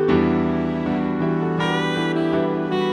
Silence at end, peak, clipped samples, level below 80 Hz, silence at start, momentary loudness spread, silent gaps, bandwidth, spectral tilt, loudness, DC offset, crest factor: 0 s; -6 dBFS; under 0.1%; -44 dBFS; 0 s; 4 LU; none; 10.5 kHz; -7 dB/octave; -21 LUFS; under 0.1%; 14 dB